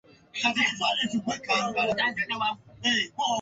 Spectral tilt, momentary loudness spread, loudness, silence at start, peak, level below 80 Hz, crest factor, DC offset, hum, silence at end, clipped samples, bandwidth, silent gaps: -2.5 dB/octave; 5 LU; -26 LUFS; 0.35 s; -12 dBFS; -64 dBFS; 16 dB; under 0.1%; none; 0 s; under 0.1%; 8 kHz; none